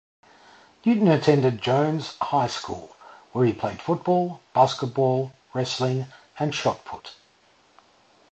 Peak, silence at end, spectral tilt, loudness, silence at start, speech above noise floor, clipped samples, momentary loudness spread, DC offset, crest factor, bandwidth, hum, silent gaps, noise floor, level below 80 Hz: -4 dBFS; 1.2 s; -6.5 dB/octave; -24 LUFS; 0.85 s; 37 dB; under 0.1%; 15 LU; under 0.1%; 20 dB; 8.6 kHz; none; none; -60 dBFS; -60 dBFS